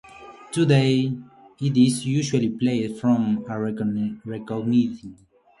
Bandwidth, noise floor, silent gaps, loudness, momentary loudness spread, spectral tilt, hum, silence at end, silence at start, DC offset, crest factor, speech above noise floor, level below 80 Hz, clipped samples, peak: 11.5 kHz; -42 dBFS; none; -23 LUFS; 12 LU; -6.5 dB/octave; none; 0.45 s; 0.15 s; under 0.1%; 16 dB; 21 dB; -60 dBFS; under 0.1%; -6 dBFS